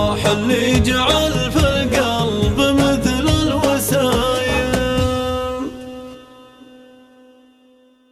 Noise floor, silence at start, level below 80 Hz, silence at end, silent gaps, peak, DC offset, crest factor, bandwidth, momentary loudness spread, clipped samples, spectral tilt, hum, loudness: -52 dBFS; 0 s; -32 dBFS; 1.7 s; none; -2 dBFS; under 0.1%; 16 dB; 15 kHz; 10 LU; under 0.1%; -5 dB/octave; none; -17 LUFS